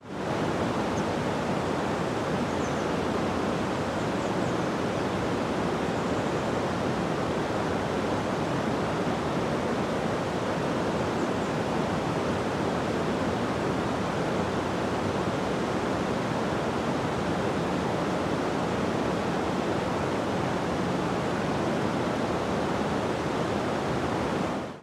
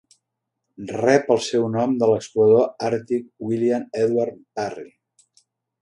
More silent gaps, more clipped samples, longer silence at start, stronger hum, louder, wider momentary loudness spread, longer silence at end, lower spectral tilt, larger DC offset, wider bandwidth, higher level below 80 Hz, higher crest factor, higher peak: neither; neither; second, 0 s vs 0.8 s; neither; second, -28 LUFS vs -21 LUFS; second, 1 LU vs 13 LU; second, 0 s vs 0.95 s; about the same, -6 dB/octave vs -6 dB/octave; neither; first, 15 kHz vs 11 kHz; first, -50 dBFS vs -64 dBFS; second, 14 dB vs 20 dB; second, -14 dBFS vs -2 dBFS